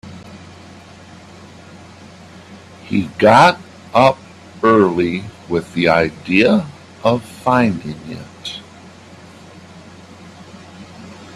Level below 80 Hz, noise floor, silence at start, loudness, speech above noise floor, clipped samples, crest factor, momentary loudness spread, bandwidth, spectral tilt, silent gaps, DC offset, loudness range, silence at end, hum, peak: -52 dBFS; -40 dBFS; 0.05 s; -15 LUFS; 26 dB; under 0.1%; 18 dB; 26 LU; 13 kHz; -6 dB/octave; none; under 0.1%; 15 LU; 0.1 s; none; 0 dBFS